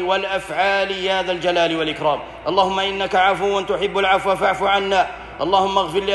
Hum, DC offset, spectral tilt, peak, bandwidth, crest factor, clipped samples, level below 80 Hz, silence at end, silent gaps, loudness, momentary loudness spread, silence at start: none; under 0.1%; -4 dB/octave; -2 dBFS; 12 kHz; 16 dB; under 0.1%; -48 dBFS; 0 s; none; -19 LUFS; 5 LU; 0 s